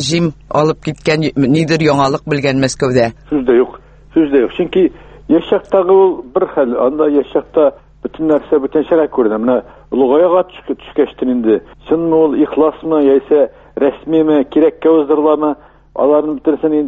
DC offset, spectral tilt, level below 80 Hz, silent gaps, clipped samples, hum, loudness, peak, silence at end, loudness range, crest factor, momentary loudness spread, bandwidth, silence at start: under 0.1%; -6.5 dB/octave; -44 dBFS; none; under 0.1%; none; -13 LUFS; 0 dBFS; 0 s; 2 LU; 12 dB; 7 LU; 8.8 kHz; 0 s